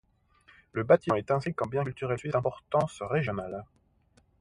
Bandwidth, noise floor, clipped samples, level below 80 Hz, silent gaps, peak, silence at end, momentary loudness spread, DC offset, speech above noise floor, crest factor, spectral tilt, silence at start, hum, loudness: 11.5 kHz; -66 dBFS; under 0.1%; -60 dBFS; none; -8 dBFS; 0.75 s; 12 LU; under 0.1%; 37 dB; 22 dB; -7.5 dB/octave; 0.75 s; none; -29 LUFS